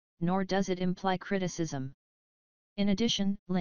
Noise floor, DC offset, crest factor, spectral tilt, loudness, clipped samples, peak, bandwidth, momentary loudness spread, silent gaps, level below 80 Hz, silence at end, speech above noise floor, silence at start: under -90 dBFS; 0.7%; 16 dB; -5.5 dB/octave; -31 LUFS; under 0.1%; -14 dBFS; 7.2 kHz; 9 LU; 1.94-2.76 s, 3.39-3.46 s; -56 dBFS; 0 s; over 60 dB; 0.15 s